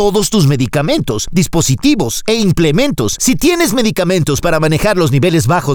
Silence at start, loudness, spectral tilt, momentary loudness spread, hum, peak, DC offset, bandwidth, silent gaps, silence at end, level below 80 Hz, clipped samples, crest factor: 0 s; -12 LUFS; -5 dB/octave; 3 LU; none; 0 dBFS; under 0.1%; over 20 kHz; none; 0 s; -32 dBFS; under 0.1%; 10 dB